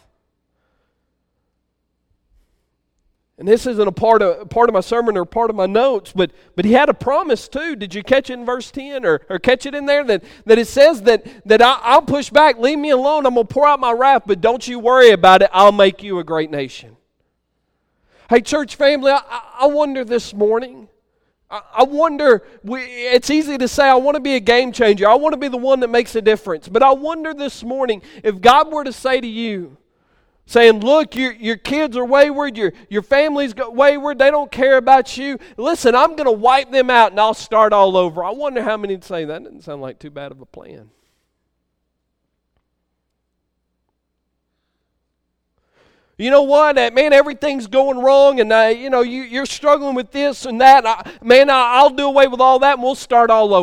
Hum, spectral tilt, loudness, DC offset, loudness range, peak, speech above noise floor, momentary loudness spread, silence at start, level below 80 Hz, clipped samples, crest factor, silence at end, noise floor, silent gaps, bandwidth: none; -4 dB/octave; -14 LUFS; under 0.1%; 7 LU; 0 dBFS; 58 dB; 13 LU; 3.4 s; -50 dBFS; under 0.1%; 16 dB; 0 s; -72 dBFS; none; 15 kHz